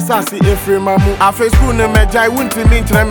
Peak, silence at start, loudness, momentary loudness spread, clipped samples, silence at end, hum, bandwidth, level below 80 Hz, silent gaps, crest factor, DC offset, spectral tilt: 0 dBFS; 0 s; -12 LUFS; 3 LU; under 0.1%; 0 s; none; over 20 kHz; -16 dBFS; none; 10 dB; under 0.1%; -5.5 dB/octave